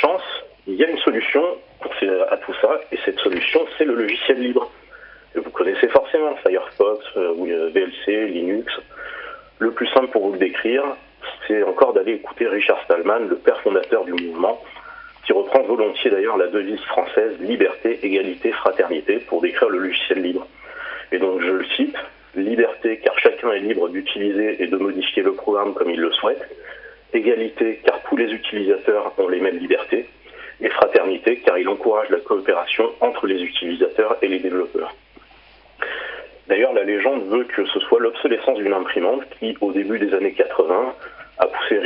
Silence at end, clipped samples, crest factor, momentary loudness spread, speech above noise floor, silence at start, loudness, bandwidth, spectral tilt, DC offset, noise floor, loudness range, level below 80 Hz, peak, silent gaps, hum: 0 s; under 0.1%; 20 dB; 12 LU; 30 dB; 0 s; -20 LUFS; 5.4 kHz; -8.5 dB/octave; under 0.1%; -49 dBFS; 2 LU; -60 dBFS; 0 dBFS; none; none